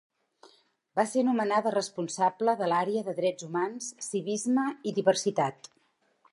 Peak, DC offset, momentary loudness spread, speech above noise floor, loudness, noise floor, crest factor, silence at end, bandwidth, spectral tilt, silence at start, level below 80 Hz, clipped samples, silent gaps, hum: -10 dBFS; under 0.1%; 8 LU; 42 dB; -29 LUFS; -70 dBFS; 18 dB; 0.8 s; 11.5 kHz; -4.5 dB/octave; 0.95 s; -82 dBFS; under 0.1%; none; none